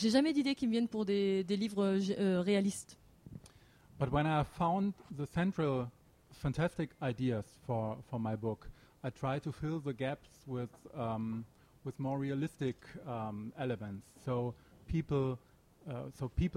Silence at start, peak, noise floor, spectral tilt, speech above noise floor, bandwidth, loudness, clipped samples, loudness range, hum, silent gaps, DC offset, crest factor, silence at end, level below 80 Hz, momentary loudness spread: 0 s; -16 dBFS; -62 dBFS; -6.5 dB/octave; 26 dB; 15 kHz; -37 LUFS; under 0.1%; 6 LU; none; none; under 0.1%; 20 dB; 0 s; -56 dBFS; 14 LU